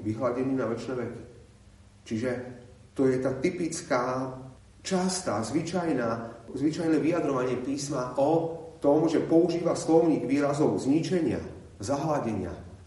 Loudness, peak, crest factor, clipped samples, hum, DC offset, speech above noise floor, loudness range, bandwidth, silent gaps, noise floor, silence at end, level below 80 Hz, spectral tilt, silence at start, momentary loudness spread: -28 LUFS; -10 dBFS; 18 dB; under 0.1%; none; under 0.1%; 27 dB; 6 LU; 11.5 kHz; none; -54 dBFS; 0 s; -60 dBFS; -6 dB/octave; 0 s; 13 LU